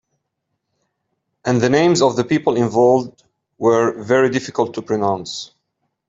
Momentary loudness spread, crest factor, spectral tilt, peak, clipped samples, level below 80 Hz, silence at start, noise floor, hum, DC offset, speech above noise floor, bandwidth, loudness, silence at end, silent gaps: 13 LU; 16 dB; -5.5 dB/octave; -2 dBFS; under 0.1%; -58 dBFS; 1.45 s; -75 dBFS; none; under 0.1%; 59 dB; 7.8 kHz; -17 LUFS; 0.65 s; none